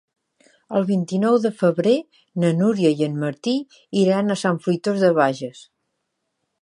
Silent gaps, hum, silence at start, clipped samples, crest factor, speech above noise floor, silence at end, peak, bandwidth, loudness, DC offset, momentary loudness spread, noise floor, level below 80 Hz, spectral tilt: none; none; 0.7 s; under 0.1%; 18 dB; 56 dB; 1.05 s; -4 dBFS; 11 kHz; -20 LUFS; under 0.1%; 8 LU; -76 dBFS; -70 dBFS; -6.5 dB/octave